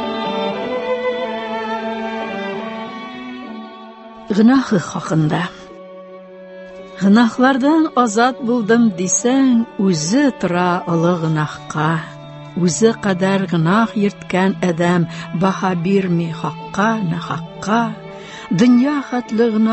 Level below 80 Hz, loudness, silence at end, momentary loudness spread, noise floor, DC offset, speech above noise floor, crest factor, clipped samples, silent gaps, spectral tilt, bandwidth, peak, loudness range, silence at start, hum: -56 dBFS; -17 LUFS; 0 s; 19 LU; -36 dBFS; under 0.1%; 21 dB; 16 dB; under 0.1%; none; -5.5 dB/octave; 8.6 kHz; -2 dBFS; 6 LU; 0 s; none